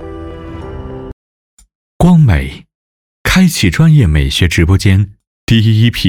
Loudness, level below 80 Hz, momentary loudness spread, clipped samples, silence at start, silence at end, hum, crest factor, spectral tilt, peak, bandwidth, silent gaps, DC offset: -10 LUFS; -26 dBFS; 19 LU; under 0.1%; 0 s; 0 s; none; 10 dB; -6 dB/octave; -2 dBFS; 17.5 kHz; 1.13-1.58 s, 1.75-2.00 s, 2.75-3.25 s, 5.27-5.47 s; under 0.1%